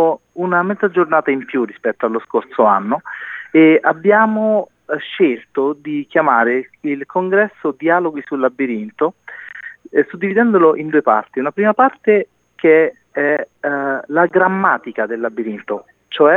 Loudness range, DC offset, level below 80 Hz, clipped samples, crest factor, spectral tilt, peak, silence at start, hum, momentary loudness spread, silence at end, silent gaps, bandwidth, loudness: 3 LU; under 0.1%; -72 dBFS; under 0.1%; 16 dB; -8.5 dB/octave; 0 dBFS; 0 s; none; 11 LU; 0 s; none; 4 kHz; -16 LUFS